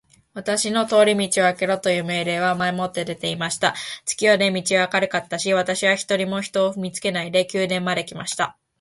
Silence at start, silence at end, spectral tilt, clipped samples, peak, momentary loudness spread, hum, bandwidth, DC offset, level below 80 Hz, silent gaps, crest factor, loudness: 0.35 s; 0.3 s; -3.5 dB/octave; under 0.1%; -4 dBFS; 9 LU; none; 11.5 kHz; under 0.1%; -64 dBFS; none; 18 dB; -21 LUFS